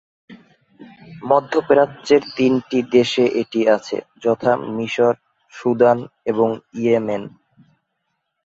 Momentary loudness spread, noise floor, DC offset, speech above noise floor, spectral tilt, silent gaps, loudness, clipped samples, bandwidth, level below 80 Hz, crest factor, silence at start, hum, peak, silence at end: 9 LU; -74 dBFS; under 0.1%; 56 dB; -6 dB/octave; none; -18 LUFS; under 0.1%; 7.8 kHz; -62 dBFS; 20 dB; 0.3 s; none; 0 dBFS; 1.2 s